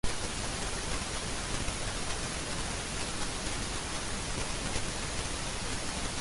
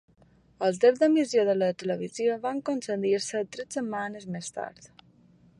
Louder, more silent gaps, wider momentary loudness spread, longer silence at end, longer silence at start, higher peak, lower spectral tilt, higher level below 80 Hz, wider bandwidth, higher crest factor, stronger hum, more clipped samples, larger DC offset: second, -35 LUFS vs -27 LUFS; neither; second, 1 LU vs 13 LU; second, 0 s vs 0.75 s; second, 0.05 s vs 0.6 s; second, -16 dBFS vs -10 dBFS; second, -2.5 dB/octave vs -5 dB/octave; first, -42 dBFS vs -72 dBFS; about the same, 11.5 kHz vs 11.5 kHz; about the same, 18 dB vs 18 dB; neither; neither; neither